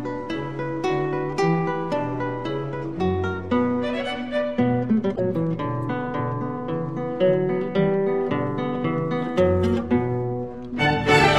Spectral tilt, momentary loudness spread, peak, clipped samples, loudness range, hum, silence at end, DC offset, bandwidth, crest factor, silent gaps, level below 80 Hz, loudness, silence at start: -7 dB/octave; 7 LU; -4 dBFS; under 0.1%; 2 LU; none; 0 s; 0.6%; 12 kHz; 18 dB; none; -48 dBFS; -24 LUFS; 0 s